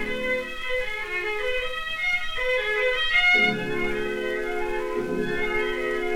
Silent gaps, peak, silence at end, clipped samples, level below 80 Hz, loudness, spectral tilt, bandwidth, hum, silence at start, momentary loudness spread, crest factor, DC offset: none; -10 dBFS; 0 s; under 0.1%; -42 dBFS; -24 LUFS; -4 dB/octave; 16.5 kHz; none; 0 s; 9 LU; 16 dB; under 0.1%